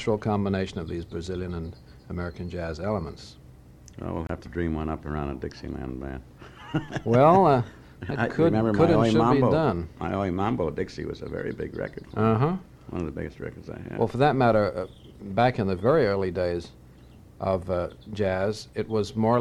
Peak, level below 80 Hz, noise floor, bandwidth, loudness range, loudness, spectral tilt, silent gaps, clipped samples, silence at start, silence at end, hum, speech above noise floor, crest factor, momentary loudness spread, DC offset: -6 dBFS; -46 dBFS; -50 dBFS; 12.5 kHz; 11 LU; -26 LUFS; -8 dB/octave; none; under 0.1%; 0 s; 0 s; none; 24 dB; 20 dB; 16 LU; under 0.1%